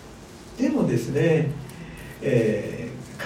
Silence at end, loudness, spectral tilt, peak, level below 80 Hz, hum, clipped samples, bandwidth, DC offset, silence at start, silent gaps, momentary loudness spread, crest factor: 0 s; -24 LUFS; -7 dB/octave; -8 dBFS; -50 dBFS; none; under 0.1%; 16 kHz; under 0.1%; 0 s; none; 18 LU; 16 dB